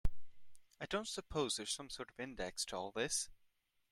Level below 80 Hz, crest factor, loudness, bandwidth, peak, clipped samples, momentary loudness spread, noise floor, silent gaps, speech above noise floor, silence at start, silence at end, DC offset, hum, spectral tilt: -52 dBFS; 20 dB; -42 LUFS; 14 kHz; -20 dBFS; under 0.1%; 10 LU; -76 dBFS; none; 34 dB; 0.05 s; 0.55 s; under 0.1%; none; -2.5 dB/octave